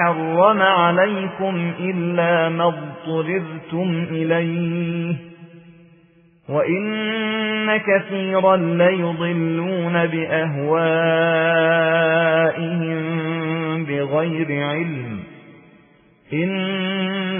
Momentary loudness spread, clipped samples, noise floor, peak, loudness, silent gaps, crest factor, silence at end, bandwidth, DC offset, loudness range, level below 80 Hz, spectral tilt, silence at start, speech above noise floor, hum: 8 LU; under 0.1%; -53 dBFS; -2 dBFS; -19 LUFS; none; 18 dB; 0 s; 3.6 kHz; under 0.1%; 6 LU; -66 dBFS; -10.5 dB/octave; 0 s; 34 dB; none